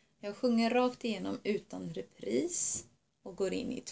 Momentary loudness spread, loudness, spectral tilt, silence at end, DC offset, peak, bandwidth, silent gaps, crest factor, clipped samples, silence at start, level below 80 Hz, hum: 13 LU; -34 LUFS; -4 dB/octave; 0 s; under 0.1%; -16 dBFS; 8 kHz; none; 18 dB; under 0.1%; 0.25 s; -68 dBFS; none